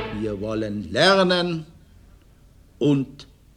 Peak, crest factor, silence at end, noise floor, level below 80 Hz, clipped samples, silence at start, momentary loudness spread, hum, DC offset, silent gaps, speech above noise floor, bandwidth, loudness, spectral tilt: -4 dBFS; 20 dB; 0.3 s; -52 dBFS; -50 dBFS; under 0.1%; 0 s; 12 LU; none; under 0.1%; none; 30 dB; 12.5 kHz; -22 LUFS; -5.5 dB/octave